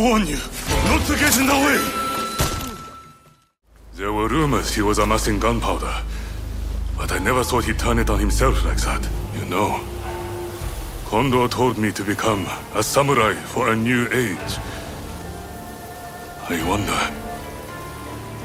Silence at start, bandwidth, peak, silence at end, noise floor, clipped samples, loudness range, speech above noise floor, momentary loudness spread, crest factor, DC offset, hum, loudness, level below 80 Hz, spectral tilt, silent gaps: 0 s; 16.5 kHz; -4 dBFS; 0 s; -51 dBFS; under 0.1%; 5 LU; 32 dB; 15 LU; 18 dB; under 0.1%; none; -21 LUFS; -30 dBFS; -4.5 dB/octave; none